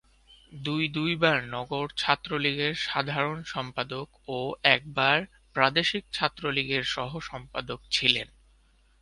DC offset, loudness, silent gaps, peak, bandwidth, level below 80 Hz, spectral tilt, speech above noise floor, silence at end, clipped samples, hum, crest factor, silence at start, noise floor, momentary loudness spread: under 0.1%; -27 LUFS; none; -4 dBFS; 11.5 kHz; -58 dBFS; -4.5 dB/octave; 34 dB; 0.75 s; under 0.1%; none; 26 dB; 0.5 s; -62 dBFS; 12 LU